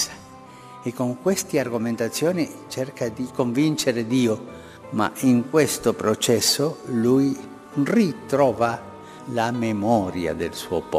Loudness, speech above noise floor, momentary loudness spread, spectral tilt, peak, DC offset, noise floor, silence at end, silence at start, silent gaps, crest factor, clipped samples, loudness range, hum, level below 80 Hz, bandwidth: -23 LUFS; 21 dB; 12 LU; -4.5 dB/octave; -4 dBFS; under 0.1%; -43 dBFS; 0 s; 0 s; none; 18 dB; under 0.1%; 3 LU; none; -58 dBFS; 15.5 kHz